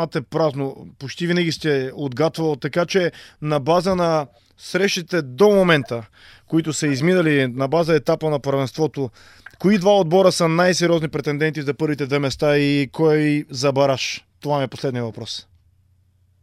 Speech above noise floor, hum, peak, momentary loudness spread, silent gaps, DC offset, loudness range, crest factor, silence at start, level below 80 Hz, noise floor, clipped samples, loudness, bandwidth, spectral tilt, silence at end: 40 dB; none; -2 dBFS; 12 LU; none; under 0.1%; 3 LU; 18 dB; 0 s; -54 dBFS; -59 dBFS; under 0.1%; -20 LUFS; 14.5 kHz; -5.5 dB/octave; 1 s